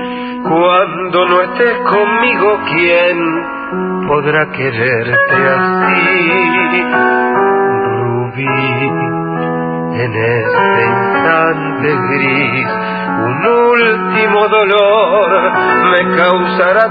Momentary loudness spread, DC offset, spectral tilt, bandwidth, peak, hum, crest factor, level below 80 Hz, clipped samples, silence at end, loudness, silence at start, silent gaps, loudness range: 7 LU; under 0.1%; -9 dB/octave; 5 kHz; 0 dBFS; none; 12 dB; -48 dBFS; under 0.1%; 0 s; -11 LUFS; 0 s; none; 4 LU